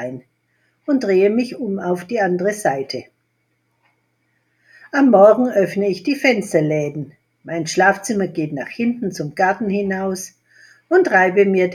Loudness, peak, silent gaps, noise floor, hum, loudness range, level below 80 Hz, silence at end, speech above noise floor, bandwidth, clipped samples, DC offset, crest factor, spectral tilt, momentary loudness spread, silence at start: -17 LUFS; 0 dBFS; none; -68 dBFS; none; 6 LU; -66 dBFS; 0 s; 51 dB; 14 kHz; under 0.1%; under 0.1%; 18 dB; -5.5 dB/octave; 15 LU; 0 s